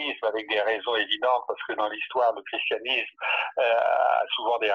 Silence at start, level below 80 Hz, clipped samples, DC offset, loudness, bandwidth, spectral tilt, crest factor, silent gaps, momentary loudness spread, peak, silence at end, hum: 0 s; -74 dBFS; under 0.1%; under 0.1%; -25 LUFS; 6.6 kHz; -3 dB/octave; 16 dB; none; 6 LU; -10 dBFS; 0 s; none